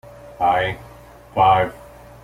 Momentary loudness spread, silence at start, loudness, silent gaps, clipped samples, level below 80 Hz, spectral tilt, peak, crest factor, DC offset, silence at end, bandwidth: 12 LU; 0.25 s; -19 LUFS; none; under 0.1%; -46 dBFS; -6 dB/octave; -4 dBFS; 18 dB; under 0.1%; 0.45 s; 15.5 kHz